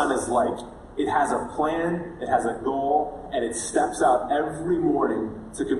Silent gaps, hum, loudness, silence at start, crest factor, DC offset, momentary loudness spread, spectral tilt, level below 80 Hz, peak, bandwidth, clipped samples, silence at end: none; none; -25 LUFS; 0 s; 16 dB; under 0.1%; 8 LU; -5 dB/octave; -50 dBFS; -8 dBFS; 12 kHz; under 0.1%; 0 s